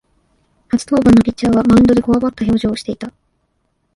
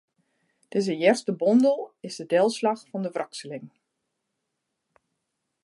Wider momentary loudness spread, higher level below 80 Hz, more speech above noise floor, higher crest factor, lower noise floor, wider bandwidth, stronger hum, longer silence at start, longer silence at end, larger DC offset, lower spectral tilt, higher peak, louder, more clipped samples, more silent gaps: about the same, 14 LU vs 16 LU; first, -36 dBFS vs -82 dBFS; second, 53 dB vs 57 dB; second, 14 dB vs 20 dB; second, -65 dBFS vs -81 dBFS; about the same, 11.5 kHz vs 11.5 kHz; neither; about the same, 0.75 s vs 0.75 s; second, 0.85 s vs 1.95 s; neither; first, -7 dB/octave vs -5.5 dB/octave; first, 0 dBFS vs -6 dBFS; first, -13 LUFS vs -24 LUFS; neither; neither